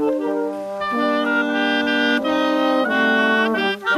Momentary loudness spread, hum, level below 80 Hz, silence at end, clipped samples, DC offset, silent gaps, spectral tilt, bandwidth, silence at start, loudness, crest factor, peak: 7 LU; none; -62 dBFS; 0 s; under 0.1%; under 0.1%; none; -4.5 dB/octave; 13.5 kHz; 0 s; -19 LUFS; 14 dB; -6 dBFS